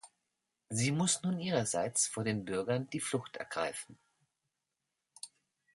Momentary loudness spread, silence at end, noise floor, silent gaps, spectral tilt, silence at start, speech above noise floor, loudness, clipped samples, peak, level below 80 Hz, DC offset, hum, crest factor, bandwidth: 19 LU; 0.5 s; -87 dBFS; none; -4 dB/octave; 0.05 s; 53 dB; -34 LUFS; under 0.1%; -16 dBFS; -72 dBFS; under 0.1%; none; 22 dB; 12 kHz